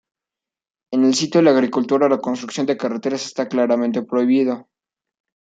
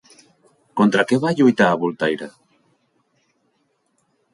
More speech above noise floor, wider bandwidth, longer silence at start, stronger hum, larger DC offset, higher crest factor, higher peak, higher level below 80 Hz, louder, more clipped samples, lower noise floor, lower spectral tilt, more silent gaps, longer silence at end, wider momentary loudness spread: first, 70 dB vs 50 dB; second, 9.2 kHz vs 11.5 kHz; first, 0.9 s vs 0.75 s; neither; neither; about the same, 16 dB vs 20 dB; about the same, -2 dBFS vs -2 dBFS; second, -70 dBFS vs -64 dBFS; about the same, -19 LUFS vs -18 LUFS; neither; first, -88 dBFS vs -67 dBFS; about the same, -5 dB/octave vs -6 dB/octave; neither; second, 0.8 s vs 2.05 s; second, 9 LU vs 14 LU